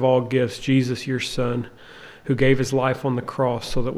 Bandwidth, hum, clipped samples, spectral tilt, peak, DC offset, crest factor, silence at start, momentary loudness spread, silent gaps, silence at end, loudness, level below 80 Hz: 13.5 kHz; none; under 0.1%; -6 dB/octave; -6 dBFS; under 0.1%; 16 dB; 0 s; 14 LU; none; 0 s; -22 LUFS; -40 dBFS